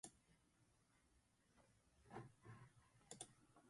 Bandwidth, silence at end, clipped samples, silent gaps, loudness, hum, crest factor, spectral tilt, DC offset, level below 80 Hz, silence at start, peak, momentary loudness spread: 11.5 kHz; 0 s; under 0.1%; none; -62 LUFS; none; 28 dB; -3.5 dB/octave; under 0.1%; -84 dBFS; 0.05 s; -38 dBFS; 6 LU